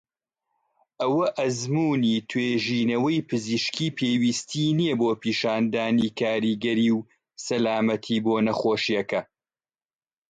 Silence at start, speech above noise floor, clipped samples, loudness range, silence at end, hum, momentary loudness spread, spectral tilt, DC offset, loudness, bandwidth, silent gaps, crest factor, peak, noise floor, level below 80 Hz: 1 s; over 66 dB; under 0.1%; 1 LU; 1.05 s; none; 4 LU; -5 dB/octave; under 0.1%; -24 LUFS; 9.2 kHz; none; 14 dB; -12 dBFS; under -90 dBFS; -66 dBFS